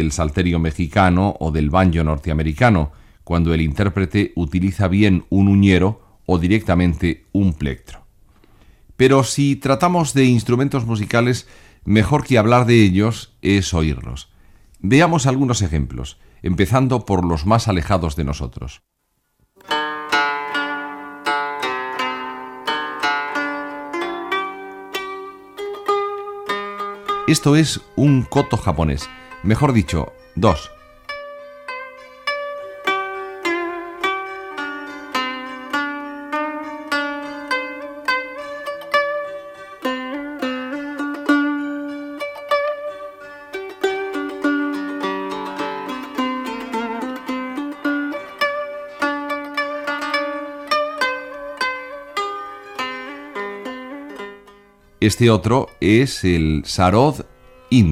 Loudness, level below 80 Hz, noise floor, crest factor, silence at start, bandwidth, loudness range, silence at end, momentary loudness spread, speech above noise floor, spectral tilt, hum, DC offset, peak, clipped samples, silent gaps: -20 LUFS; -36 dBFS; -67 dBFS; 18 dB; 0 s; 15.5 kHz; 8 LU; 0 s; 15 LU; 51 dB; -6 dB/octave; none; under 0.1%; -2 dBFS; under 0.1%; none